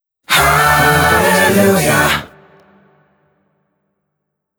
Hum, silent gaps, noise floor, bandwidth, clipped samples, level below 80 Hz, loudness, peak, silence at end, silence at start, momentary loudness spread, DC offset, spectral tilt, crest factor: none; none; -72 dBFS; over 20 kHz; under 0.1%; -38 dBFS; -11 LUFS; -2 dBFS; 2.35 s; 0.3 s; 4 LU; under 0.1%; -3.5 dB/octave; 14 dB